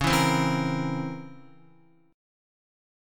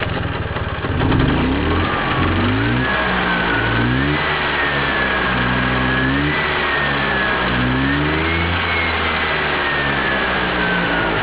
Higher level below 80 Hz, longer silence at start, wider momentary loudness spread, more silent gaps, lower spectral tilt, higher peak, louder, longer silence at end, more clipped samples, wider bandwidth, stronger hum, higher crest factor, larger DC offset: second, -50 dBFS vs -30 dBFS; about the same, 0 s vs 0 s; first, 18 LU vs 1 LU; neither; second, -5 dB/octave vs -9 dB/octave; second, -10 dBFS vs 0 dBFS; second, -26 LUFS vs -17 LUFS; first, 0.95 s vs 0 s; neither; first, 17.5 kHz vs 4 kHz; neither; about the same, 20 dB vs 16 dB; second, under 0.1% vs 0.3%